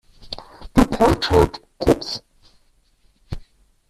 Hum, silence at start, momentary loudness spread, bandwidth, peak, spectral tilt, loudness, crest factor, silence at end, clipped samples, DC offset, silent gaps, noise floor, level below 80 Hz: none; 0.2 s; 21 LU; 14.5 kHz; -2 dBFS; -6 dB/octave; -19 LUFS; 20 dB; 0.5 s; under 0.1%; under 0.1%; none; -59 dBFS; -32 dBFS